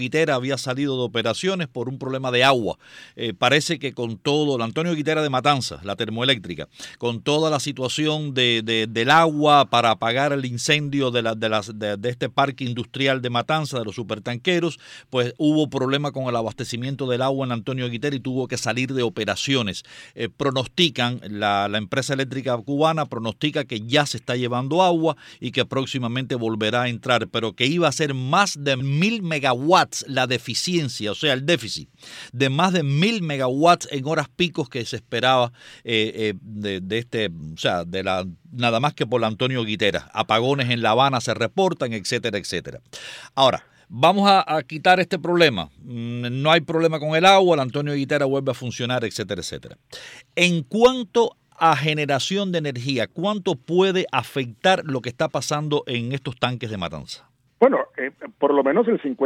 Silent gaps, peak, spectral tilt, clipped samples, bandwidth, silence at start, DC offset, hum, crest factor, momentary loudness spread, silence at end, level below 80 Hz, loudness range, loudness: none; -4 dBFS; -4.5 dB/octave; under 0.1%; 16 kHz; 0 s; under 0.1%; none; 18 dB; 11 LU; 0 s; -60 dBFS; 5 LU; -21 LUFS